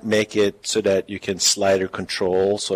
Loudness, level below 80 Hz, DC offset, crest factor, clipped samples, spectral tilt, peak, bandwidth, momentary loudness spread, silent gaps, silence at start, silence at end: -20 LUFS; -60 dBFS; under 0.1%; 14 dB; under 0.1%; -3 dB/octave; -6 dBFS; 16 kHz; 6 LU; none; 0.05 s; 0 s